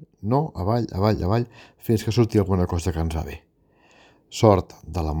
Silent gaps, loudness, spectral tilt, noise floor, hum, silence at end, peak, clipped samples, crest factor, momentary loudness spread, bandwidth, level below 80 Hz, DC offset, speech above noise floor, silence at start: none; -23 LUFS; -7 dB/octave; -59 dBFS; none; 0 s; 0 dBFS; under 0.1%; 22 dB; 15 LU; 19.5 kHz; -38 dBFS; under 0.1%; 37 dB; 0 s